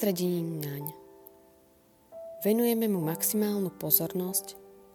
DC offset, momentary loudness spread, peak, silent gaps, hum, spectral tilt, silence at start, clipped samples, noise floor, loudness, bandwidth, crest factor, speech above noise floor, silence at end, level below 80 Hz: under 0.1%; 18 LU; -8 dBFS; none; none; -5 dB/octave; 0 s; under 0.1%; -62 dBFS; -28 LUFS; 19 kHz; 24 dB; 33 dB; 0.2 s; -72 dBFS